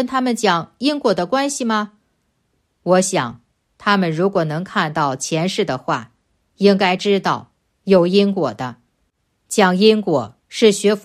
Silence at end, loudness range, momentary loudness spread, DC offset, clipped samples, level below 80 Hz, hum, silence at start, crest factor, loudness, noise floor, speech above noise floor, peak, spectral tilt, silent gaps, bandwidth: 0.05 s; 3 LU; 10 LU; under 0.1%; under 0.1%; -62 dBFS; none; 0 s; 18 dB; -17 LUFS; -67 dBFS; 51 dB; 0 dBFS; -4.5 dB/octave; none; 14 kHz